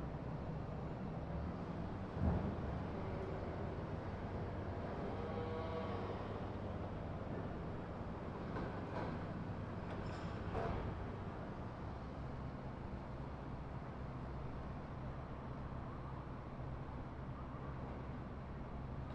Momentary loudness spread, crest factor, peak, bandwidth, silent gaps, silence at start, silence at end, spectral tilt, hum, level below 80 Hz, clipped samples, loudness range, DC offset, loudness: 5 LU; 18 dB; -26 dBFS; 8.6 kHz; none; 0 s; 0 s; -8.5 dB/octave; none; -52 dBFS; under 0.1%; 5 LU; under 0.1%; -46 LUFS